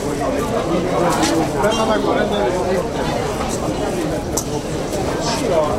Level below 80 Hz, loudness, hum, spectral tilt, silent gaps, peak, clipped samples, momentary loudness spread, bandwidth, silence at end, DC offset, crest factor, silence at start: -34 dBFS; -19 LUFS; none; -4.5 dB/octave; none; -2 dBFS; under 0.1%; 5 LU; 16 kHz; 0 s; under 0.1%; 16 dB; 0 s